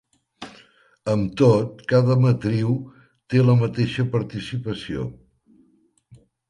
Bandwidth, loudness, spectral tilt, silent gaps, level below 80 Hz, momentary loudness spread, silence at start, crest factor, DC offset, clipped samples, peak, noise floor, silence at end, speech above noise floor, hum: 10 kHz; -21 LUFS; -8 dB/octave; none; -52 dBFS; 19 LU; 0.4 s; 18 dB; under 0.1%; under 0.1%; -4 dBFS; -61 dBFS; 0.35 s; 41 dB; none